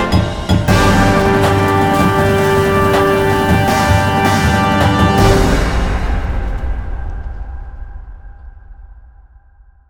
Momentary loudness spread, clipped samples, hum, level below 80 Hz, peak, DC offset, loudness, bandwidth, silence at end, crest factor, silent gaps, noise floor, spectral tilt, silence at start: 16 LU; under 0.1%; none; -22 dBFS; 0 dBFS; under 0.1%; -13 LUFS; over 20 kHz; 0.85 s; 14 dB; none; -45 dBFS; -6 dB/octave; 0 s